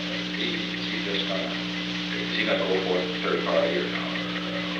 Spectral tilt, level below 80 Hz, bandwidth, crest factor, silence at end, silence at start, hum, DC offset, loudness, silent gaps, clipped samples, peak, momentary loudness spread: -5 dB/octave; -56 dBFS; 9.2 kHz; 16 dB; 0 s; 0 s; 60 Hz at -35 dBFS; under 0.1%; -26 LUFS; none; under 0.1%; -10 dBFS; 5 LU